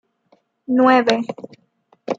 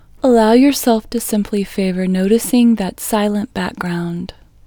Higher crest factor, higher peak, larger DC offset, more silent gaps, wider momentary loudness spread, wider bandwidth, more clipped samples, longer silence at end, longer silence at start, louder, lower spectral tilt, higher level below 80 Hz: about the same, 18 dB vs 16 dB; about the same, -2 dBFS vs 0 dBFS; neither; neither; first, 23 LU vs 11 LU; second, 7.6 kHz vs over 20 kHz; neither; second, 0.05 s vs 0.4 s; first, 0.7 s vs 0.25 s; about the same, -16 LUFS vs -15 LUFS; about the same, -5 dB/octave vs -5.5 dB/octave; second, -74 dBFS vs -42 dBFS